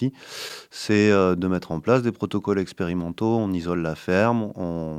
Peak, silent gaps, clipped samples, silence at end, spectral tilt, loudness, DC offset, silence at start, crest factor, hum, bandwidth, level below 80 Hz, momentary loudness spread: -4 dBFS; none; under 0.1%; 0 s; -6.5 dB/octave; -23 LUFS; under 0.1%; 0 s; 18 dB; none; 15.5 kHz; -54 dBFS; 12 LU